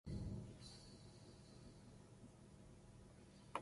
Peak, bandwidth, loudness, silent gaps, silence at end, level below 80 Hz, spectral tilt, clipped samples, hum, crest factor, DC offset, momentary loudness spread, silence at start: -28 dBFS; 11.5 kHz; -58 LUFS; none; 0 s; -64 dBFS; -6 dB/octave; under 0.1%; none; 28 dB; under 0.1%; 13 LU; 0.05 s